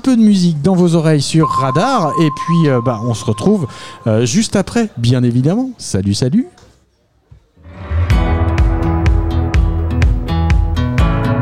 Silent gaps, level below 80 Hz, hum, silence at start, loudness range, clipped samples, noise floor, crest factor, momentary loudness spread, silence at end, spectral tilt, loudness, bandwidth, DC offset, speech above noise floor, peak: none; -20 dBFS; none; 0.05 s; 4 LU; under 0.1%; -56 dBFS; 12 dB; 6 LU; 0 s; -6.5 dB/octave; -14 LUFS; 12.5 kHz; 0.5%; 43 dB; -2 dBFS